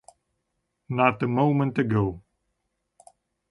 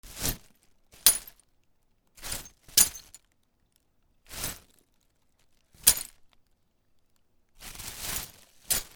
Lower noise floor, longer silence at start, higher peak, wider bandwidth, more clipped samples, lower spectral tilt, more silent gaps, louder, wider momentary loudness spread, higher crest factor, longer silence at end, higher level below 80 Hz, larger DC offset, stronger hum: first, -78 dBFS vs -70 dBFS; first, 0.9 s vs 0.05 s; second, -6 dBFS vs 0 dBFS; second, 11 kHz vs over 20 kHz; neither; first, -8.5 dB/octave vs 0.5 dB/octave; neither; about the same, -24 LUFS vs -26 LUFS; second, 9 LU vs 22 LU; second, 20 dB vs 32 dB; first, 1.3 s vs 0.1 s; about the same, -54 dBFS vs -50 dBFS; neither; neither